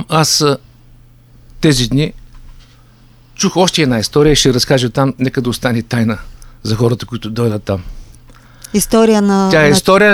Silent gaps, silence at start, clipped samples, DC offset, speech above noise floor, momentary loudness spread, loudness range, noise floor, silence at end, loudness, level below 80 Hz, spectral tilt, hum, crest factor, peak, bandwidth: none; 0 s; under 0.1%; under 0.1%; 32 dB; 11 LU; 5 LU; -43 dBFS; 0 s; -13 LUFS; -34 dBFS; -4.5 dB/octave; none; 14 dB; 0 dBFS; over 20 kHz